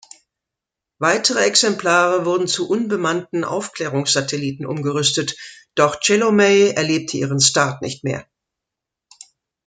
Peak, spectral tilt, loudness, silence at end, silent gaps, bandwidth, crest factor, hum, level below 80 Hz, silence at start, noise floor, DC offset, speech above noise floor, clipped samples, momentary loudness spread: 0 dBFS; -3 dB/octave; -18 LUFS; 1.45 s; none; 9.6 kHz; 18 dB; none; -64 dBFS; 1 s; -85 dBFS; under 0.1%; 67 dB; under 0.1%; 11 LU